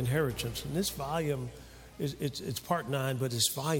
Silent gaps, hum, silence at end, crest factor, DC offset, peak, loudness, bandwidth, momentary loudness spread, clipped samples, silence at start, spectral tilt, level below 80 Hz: none; none; 0 s; 20 dB; under 0.1%; -14 dBFS; -33 LUFS; 17 kHz; 9 LU; under 0.1%; 0 s; -4.5 dB/octave; -54 dBFS